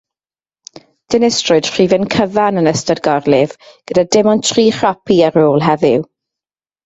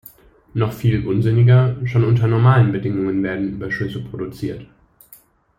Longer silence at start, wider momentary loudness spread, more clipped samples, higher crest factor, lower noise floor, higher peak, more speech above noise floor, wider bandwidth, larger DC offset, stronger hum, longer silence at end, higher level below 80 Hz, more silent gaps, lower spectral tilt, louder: first, 1.1 s vs 0.55 s; second, 5 LU vs 15 LU; neither; about the same, 14 dB vs 16 dB; first, under -90 dBFS vs -50 dBFS; about the same, 0 dBFS vs -2 dBFS; first, over 78 dB vs 33 dB; second, 8.2 kHz vs 15 kHz; neither; neither; second, 0.8 s vs 0.95 s; about the same, -50 dBFS vs -46 dBFS; neither; second, -4.5 dB/octave vs -9 dB/octave; first, -13 LUFS vs -18 LUFS